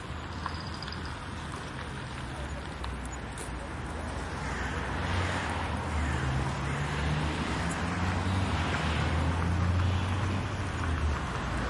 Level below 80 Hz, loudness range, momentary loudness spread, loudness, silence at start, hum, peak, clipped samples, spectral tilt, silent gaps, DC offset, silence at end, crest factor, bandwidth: -40 dBFS; 8 LU; 9 LU; -32 LUFS; 0 s; none; -16 dBFS; under 0.1%; -5.5 dB/octave; none; under 0.1%; 0 s; 14 dB; 11.5 kHz